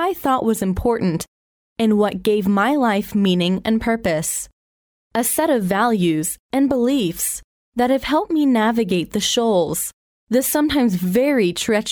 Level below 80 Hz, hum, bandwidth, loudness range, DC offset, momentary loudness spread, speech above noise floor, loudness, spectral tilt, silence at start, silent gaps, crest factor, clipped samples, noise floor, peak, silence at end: -44 dBFS; none; over 20 kHz; 1 LU; under 0.1%; 6 LU; over 72 dB; -19 LUFS; -4.5 dB/octave; 0 s; 1.28-1.76 s, 4.53-5.10 s, 6.39-6.49 s, 7.44-7.72 s, 9.93-10.27 s; 14 dB; under 0.1%; under -90 dBFS; -4 dBFS; 0 s